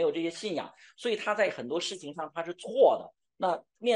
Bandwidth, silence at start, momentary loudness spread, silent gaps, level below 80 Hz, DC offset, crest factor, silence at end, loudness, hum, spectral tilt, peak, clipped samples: 11 kHz; 0 s; 13 LU; none; -82 dBFS; under 0.1%; 18 dB; 0 s; -30 LUFS; none; -3.5 dB/octave; -10 dBFS; under 0.1%